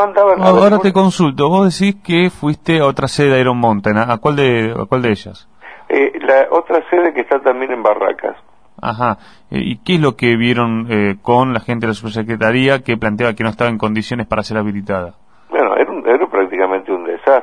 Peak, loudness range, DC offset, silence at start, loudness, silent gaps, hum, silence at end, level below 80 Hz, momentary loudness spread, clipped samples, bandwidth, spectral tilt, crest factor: 0 dBFS; 4 LU; 0.6%; 0 s; -14 LUFS; none; none; 0 s; -46 dBFS; 9 LU; under 0.1%; 10.5 kHz; -6.5 dB/octave; 14 dB